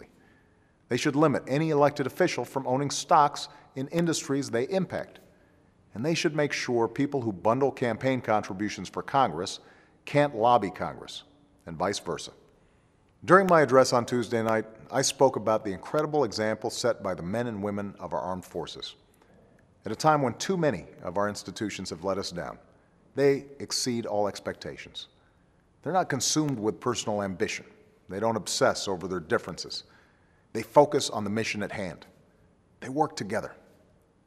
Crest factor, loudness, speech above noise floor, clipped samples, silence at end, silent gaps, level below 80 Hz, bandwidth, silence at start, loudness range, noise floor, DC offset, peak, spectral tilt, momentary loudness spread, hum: 24 dB; -27 LUFS; 36 dB; under 0.1%; 0.7 s; none; -64 dBFS; 14.5 kHz; 0 s; 6 LU; -63 dBFS; under 0.1%; -4 dBFS; -4.5 dB/octave; 15 LU; none